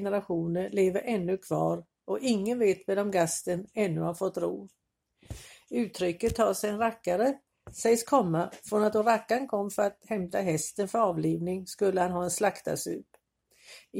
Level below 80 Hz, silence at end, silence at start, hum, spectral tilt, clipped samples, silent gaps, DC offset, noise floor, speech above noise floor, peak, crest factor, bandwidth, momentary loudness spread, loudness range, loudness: -60 dBFS; 0 s; 0 s; none; -5 dB/octave; under 0.1%; none; under 0.1%; -66 dBFS; 37 dB; -10 dBFS; 20 dB; 16.5 kHz; 9 LU; 4 LU; -29 LUFS